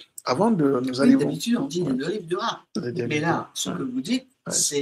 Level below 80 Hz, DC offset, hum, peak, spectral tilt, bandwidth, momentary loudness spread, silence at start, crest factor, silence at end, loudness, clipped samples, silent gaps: -66 dBFS; under 0.1%; none; -6 dBFS; -4 dB/octave; 15.5 kHz; 9 LU; 0 s; 18 dB; 0 s; -24 LUFS; under 0.1%; none